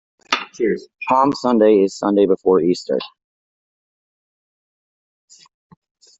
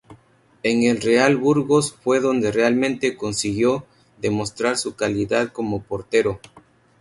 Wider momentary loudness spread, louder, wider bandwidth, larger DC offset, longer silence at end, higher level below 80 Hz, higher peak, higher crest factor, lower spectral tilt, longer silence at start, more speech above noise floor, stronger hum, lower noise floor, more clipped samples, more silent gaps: about the same, 10 LU vs 9 LU; first, -17 LUFS vs -21 LUFS; second, 8 kHz vs 11.5 kHz; neither; first, 3.15 s vs 0.4 s; second, -62 dBFS vs -54 dBFS; about the same, -2 dBFS vs -4 dBFS; about the same, 18 dB vs 18 dB; about the same, -5.5 dB/octave vs -5 dB/octave; first, 0.3 s vs 0.1 s; first, over 74 dB vs 35 dB; neither; first, under -90 dBFS vs -55 dBFS; neither; neither